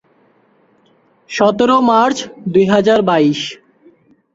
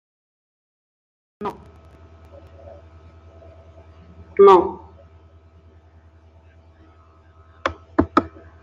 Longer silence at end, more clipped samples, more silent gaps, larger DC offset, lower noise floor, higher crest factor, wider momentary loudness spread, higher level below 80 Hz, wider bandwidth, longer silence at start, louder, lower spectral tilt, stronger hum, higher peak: first, 0.8 s vs 0.35 s; neither; neither; neither; about the same, -54 dBFS vs -51 dBFS; second, 14 dB vs 24 dB; second, 11 LU vs 21 LU; second, -56 dBFS vs -50 dBFS; first, 8 kHz vs 7.2 kHz; about the same, 1.3 s vs 1.4 s; first, -13 LUFS vs -18 LUFS; second, -5.5 dB/octave vs -7.5 dB/octave; neither; about the same, -2 dBFS vs 0 dBFS